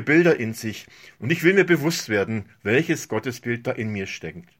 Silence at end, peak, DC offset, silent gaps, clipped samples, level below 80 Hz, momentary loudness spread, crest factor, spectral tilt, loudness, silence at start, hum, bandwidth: 0.2 s; -4 dBFS; under 0.1%; none; under 0.1%; -62 dBFS; 14 LU; 18 dB; -5.5 dB/octave; -22 LUFS; 0 s; none; 16.5 kHz